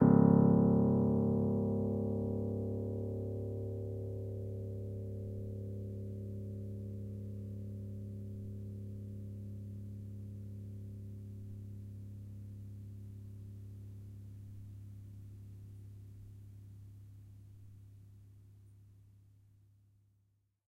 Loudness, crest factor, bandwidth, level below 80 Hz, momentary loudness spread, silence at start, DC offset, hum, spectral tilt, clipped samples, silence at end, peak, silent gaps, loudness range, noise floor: -37 LUFS; 24 dB; 2.2 kHz; -58 dBFS; 23 LU; 0 s; under 0.1%; none; -12 dB/octave; under 0.1%; 1.75 s; -14 dBFS; none; 20 LU; -76 dBFS